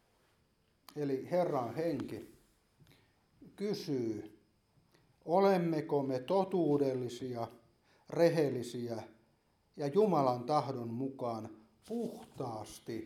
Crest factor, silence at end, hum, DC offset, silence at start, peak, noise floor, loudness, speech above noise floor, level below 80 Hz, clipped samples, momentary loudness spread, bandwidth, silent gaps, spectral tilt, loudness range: 20 dB; 0 s; none; under 0.1%; 0.95 s; -16 dBFS; -74 dBFS; -35 LUFS; 40 dB; -76 dBFS; under 0.1%; 15 LU; 15 kHz; none; -7 dB/octave; 6 LU